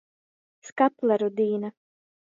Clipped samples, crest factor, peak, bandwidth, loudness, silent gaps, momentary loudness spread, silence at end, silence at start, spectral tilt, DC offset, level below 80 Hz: under 0.1%; 20 dB; -8 dBFS; 7.6 kHz; -25 LUFS; 0.72-0.76 s; 14 LU; 0.55 s; 0.65 s; -6.5 dB/octave; under 0.1%; -78 dBFS